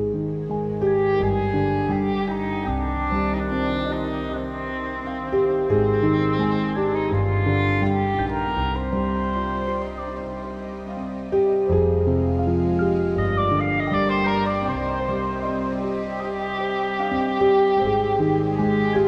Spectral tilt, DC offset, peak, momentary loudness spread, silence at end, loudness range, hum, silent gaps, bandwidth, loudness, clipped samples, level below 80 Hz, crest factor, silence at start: -9 dB/octave; under 0.1%; -8 dBFS; 9 LU; 0 s; 4 LU; none; none; 6.6 kHz; -23 LUFS; under 0.1%; -36 dBFS; 14 dB; 0 s